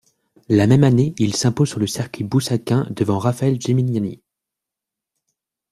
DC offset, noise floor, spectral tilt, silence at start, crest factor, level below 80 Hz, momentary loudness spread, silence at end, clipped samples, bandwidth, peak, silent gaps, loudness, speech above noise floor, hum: under 0.1%; -85 dBFS; -6.5 dB/octave; 0.5 s; 18 dB; -52 dBFS; 9 LU; 1.55 s; under 0.1%; 14 kHz; -2 dBFS; none; -19 LUFS; 68 dB; none